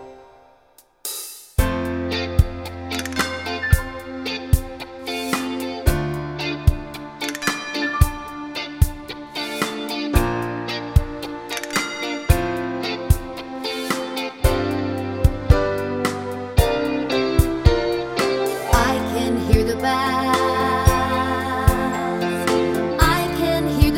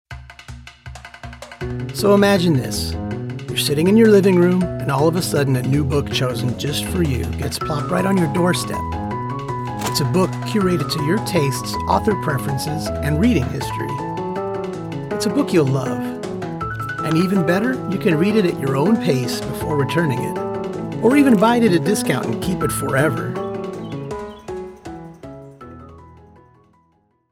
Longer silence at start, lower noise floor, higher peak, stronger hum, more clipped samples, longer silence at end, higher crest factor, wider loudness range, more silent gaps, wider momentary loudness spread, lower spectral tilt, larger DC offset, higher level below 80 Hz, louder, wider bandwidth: about the same, 0 s vs 0.1 s; second, -54 dBFS vs -61 dBFS; about the same, 0 dBFS vs -2 dBFS; neither; neither; second, 0 s vs 1.15 s; about the same, 20 dB vs 16 dB; about the same, 5 LU vs 6 LU; neither; second, 10 LU vs 17 LU; about the same, -5.5 dB/octave vs -6 dB/octave; neither; first, -26 dBFS vs -40 dBFS; second, -22 LUFS vs -19 LUFS; about the same, 17 kHz vs 17 kHz